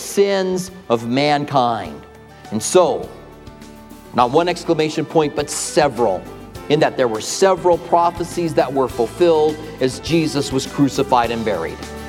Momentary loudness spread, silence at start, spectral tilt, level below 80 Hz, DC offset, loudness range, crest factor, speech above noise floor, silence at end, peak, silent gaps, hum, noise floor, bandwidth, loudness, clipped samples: 10 LU; 0 s; -4.5 dB/octave; -44 dBFS; under 0.1%; 2 LU; 18 dB; 21 dB; 0 s; 0 dBFS; none; none; -38 dBFS; 16.5 kHz; -18 LUFS; under 0.1%